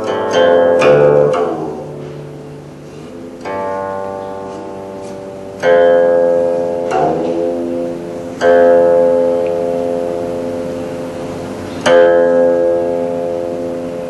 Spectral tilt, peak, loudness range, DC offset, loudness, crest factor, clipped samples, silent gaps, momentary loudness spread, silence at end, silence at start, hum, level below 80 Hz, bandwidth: -6 dB/octave; 0 dBFS; 11 LU; under 0.1%; -13 LUFS; 14 dB; under 0.1%; none; 19 LU; 0 s; 0 s; none; -50 dBFS; 11.5 kHz